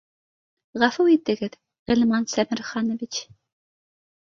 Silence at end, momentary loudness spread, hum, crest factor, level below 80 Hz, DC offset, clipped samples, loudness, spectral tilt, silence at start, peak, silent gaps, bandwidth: 1.1 s; 13 LU; none; 22 dB; -58 dBFS; under 0.1%; under 0.1%; -23 LUFS; -4 dB/octave; 0.75 s; -2 dBFS; 1.79-1.86 s; 7.6 kHz